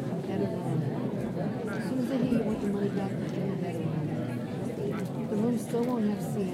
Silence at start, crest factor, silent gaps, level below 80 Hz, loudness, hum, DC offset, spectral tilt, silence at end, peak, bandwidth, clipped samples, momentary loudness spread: 0 s; 16 dB; none; -60 dBFS; -31 LUFS; none; under 0.1%; -8 dB/octave; 0 s; -14 dBFS; 15.5 kHz; under 0.1%; 5 LU